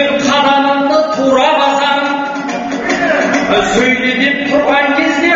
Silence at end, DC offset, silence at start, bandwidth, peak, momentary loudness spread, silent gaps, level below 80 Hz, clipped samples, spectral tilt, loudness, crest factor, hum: 0 s; under 0.1%; 0 s; 8 kHz; 0 dBFS; 6 LU; none; -44 dBFS; under 0.1%; -1.5 dB/octave; -11 LUFS; 12 dB; none